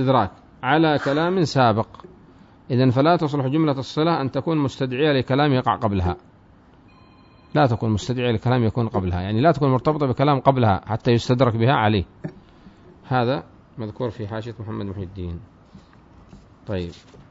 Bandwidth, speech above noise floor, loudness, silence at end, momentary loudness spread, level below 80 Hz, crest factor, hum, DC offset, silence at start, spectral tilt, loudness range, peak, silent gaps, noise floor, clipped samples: 7.8 kHz; 31 dB; -21 LUFS; 0.35 s; 14 LU; -48 dBFS; 20 dB; none; under 0.1%; 0 s; -7.5 dB/octave; 9 LU; -2 dBFS; none; -51 dBFS; under 0.1%